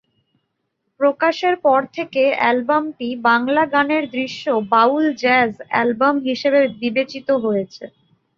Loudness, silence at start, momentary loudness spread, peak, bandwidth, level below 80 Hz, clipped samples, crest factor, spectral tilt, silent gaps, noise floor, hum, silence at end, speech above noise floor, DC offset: -18 LUFS; 1 s; 6 LU; -2 dBFS; 7.2 kHz; -66 dBFS; under 0.1%; 16 dB; -5.5 dB/octave; none; -73 dBFS; none; 0.5 s; 55 dB; under 0.1%